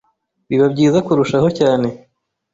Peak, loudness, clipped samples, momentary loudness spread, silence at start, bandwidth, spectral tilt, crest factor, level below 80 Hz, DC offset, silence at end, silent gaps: -2 dBFS; -15 LUFS; under 0.1%; 6 LU; 0.5 s; 8 kHz; -7 dB/octave; 14 dB; -52 dBFS; under 0.1%; 0.55 s; none